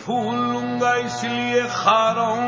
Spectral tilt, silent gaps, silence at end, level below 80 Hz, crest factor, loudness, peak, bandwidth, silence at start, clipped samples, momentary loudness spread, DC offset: -4.5 dB/octave; none; 0 s; -60 dBFS; 18 dB; -20 LUFS; -4 dBFS; 7.8 kHz; 0 s; under 0.1%; 6 LU; under 0.1%